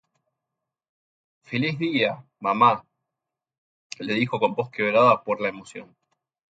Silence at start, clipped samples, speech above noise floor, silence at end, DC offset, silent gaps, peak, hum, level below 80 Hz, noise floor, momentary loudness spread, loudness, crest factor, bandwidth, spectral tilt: 1.5 s; under 0.1%; 64 dB; 0.65 s; under 0.1%; 3.58-3.90 s; -4 dBFS; none; -70 dBFS; -86 dBFS; 18 LU; -23 LUFS; 22 dB; 9.2 kHz; -6 dB/octave